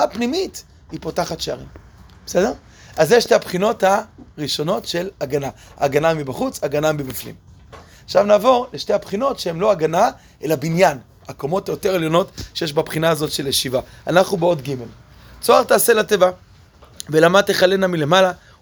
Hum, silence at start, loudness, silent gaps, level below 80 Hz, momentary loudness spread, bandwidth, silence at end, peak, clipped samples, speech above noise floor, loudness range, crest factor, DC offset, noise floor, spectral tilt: none; 0 s; -18 LUFS; none; -50 dBFS; 16 LU; over 20 kHz; 0.25 s; 0 dBFS; under 0.1%; 29 dB; 5 LU; 18 dB; under 0.1%; -47 dBFS; -4.5 dB/octave